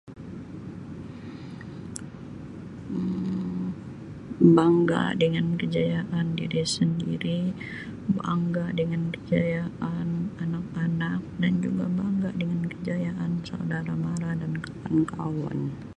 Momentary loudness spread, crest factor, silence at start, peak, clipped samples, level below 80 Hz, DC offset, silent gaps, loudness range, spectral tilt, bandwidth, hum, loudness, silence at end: 15 LU; 20 dB; 0.05 s; -6 dBFS; under 0.1%; -54 dBFS; under 0.1%; none; 10 LU; -7 dB/octave; 11 kHz; none; -27 LUFS; 0.05 s